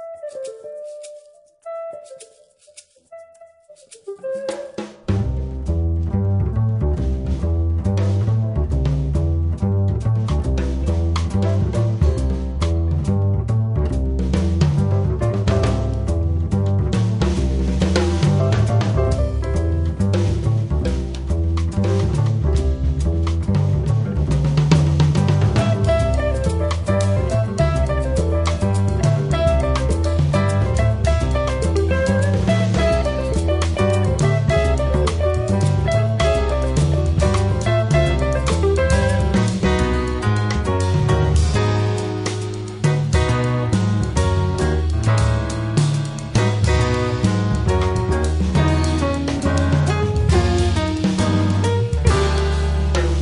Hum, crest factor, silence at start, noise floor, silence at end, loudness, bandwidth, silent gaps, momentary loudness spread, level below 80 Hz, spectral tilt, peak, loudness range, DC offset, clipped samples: none; 16 dB; 0 s; -51 dBFS; 0 s; -19 LUFS; 11 kHz; none; 5 LU; -24 dBFS; -7 dB/octave; 0 dBFS; 3 LU; under 0.1%; under 0.1%